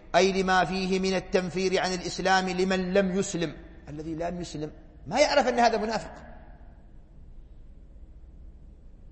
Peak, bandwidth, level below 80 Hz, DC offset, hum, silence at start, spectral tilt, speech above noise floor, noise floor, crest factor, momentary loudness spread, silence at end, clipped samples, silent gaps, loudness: -8 dBFS; 8.8 kHz; -48 dBFS; under 0.1%; none; 0 s; -4.5 dB/octave; 23 dB; -49 dBFS; 20 dB; 17 LU; 0 s; under 0.1%; none; -26 LUFS